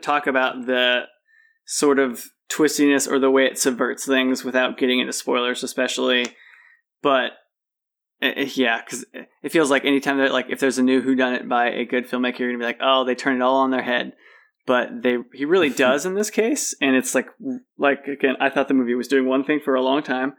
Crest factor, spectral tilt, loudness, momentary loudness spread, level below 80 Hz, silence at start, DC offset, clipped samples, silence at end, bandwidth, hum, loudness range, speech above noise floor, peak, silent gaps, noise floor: 16 dB; -2.5 dB/octave; -20 LUFS; 7 LU; -88 dBFS; 0 s; under 0.1%; under 0.1%; 0.05 s; 19 kHz; none; 3 LU; 65 dB; -6 dBFS; none; -86 dBFS